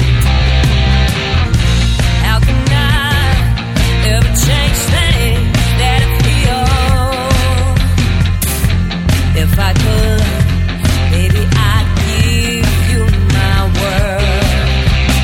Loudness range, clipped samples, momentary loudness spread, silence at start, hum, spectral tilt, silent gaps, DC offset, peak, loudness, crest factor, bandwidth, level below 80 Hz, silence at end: 1 LU; under 0.1%; 2 LU; 0 s; none; -5 dB/octave; none; under 0.1%; 0 dBFS; -12 LUFS; 10 dB; 17 kHz; -16 dBFS; 0 s